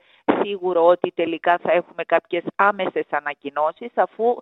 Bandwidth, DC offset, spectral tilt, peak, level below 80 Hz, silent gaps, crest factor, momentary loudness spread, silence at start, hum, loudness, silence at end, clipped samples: 4.1 kHz; under 0.1%; -7.5 dB/octave; -2 dBFS; -68 dBFS; none; 20 dB; 7 LU; 0.3 s; none; -21 LUFS; 0 s; under 0.1%